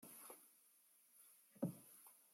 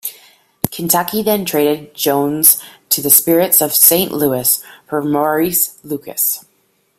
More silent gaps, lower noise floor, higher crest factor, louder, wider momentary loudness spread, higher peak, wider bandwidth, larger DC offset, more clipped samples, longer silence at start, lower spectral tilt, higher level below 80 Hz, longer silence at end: neither; first, -74 dBFS vs -60 dBFS; first, 26 dB vs 16 dB; second, -53 LUFS vs -13 LUFS; first, 18 LU vs 14 LU; second, -30 dBFS vs 0 dBFS; second, 16.5 kHz vs over 20 kHz; neither; second, under 0.1% vs 0.1%; about the same, 0 s vs 0.05 s; first, -6 dB/octave vs -3 dB/octave; second, under -90 dBFS vs -54 dBFS; second, 0 s vs 0.6 s